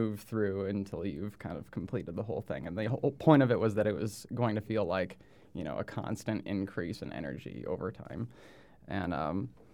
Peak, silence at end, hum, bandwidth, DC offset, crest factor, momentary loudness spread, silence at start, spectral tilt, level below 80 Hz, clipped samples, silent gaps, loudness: -10 dBFS; 0.2 s; none; 18.5 kHz; under 0.1%; 24 dB; 12 LU; 0 s; -7.5 dB/octave; -62 dBFS; under 0.1%; none; -34 LUFS